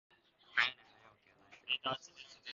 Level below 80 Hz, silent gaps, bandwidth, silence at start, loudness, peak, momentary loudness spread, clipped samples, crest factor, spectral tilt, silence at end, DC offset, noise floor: -80 dBFS; none; 7.4 kHz; 0.55 s; -37 LUFS; -16 dBFS; 20 LU; under 0.1%; 26 dB; 1.5 dB/octave; 0 s; under 0.1%; -66 dBFS